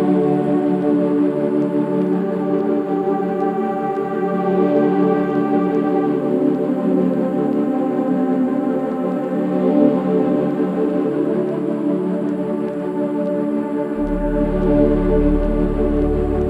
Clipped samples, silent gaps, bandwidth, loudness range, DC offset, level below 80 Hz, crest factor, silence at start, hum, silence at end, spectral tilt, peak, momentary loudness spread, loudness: under 0.1%; none; 4.9 kHz; 3 LU; under 0.1%; -30 dBFS; 16 dB; 0 s; none; 0 s; -10 dB/octave; -2 dBFS; 5 LU; -18 LUFS